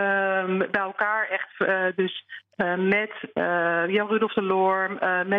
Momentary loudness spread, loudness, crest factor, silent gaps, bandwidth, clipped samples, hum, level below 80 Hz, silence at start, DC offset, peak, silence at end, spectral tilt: 6 LU; -24 LUFS; 16 dB; none; 4.9 kHz; under 0.1%; none; -70 dBFS; 0 s; under 0.1%; -8 dBFS; 0 s; -8 dB/octave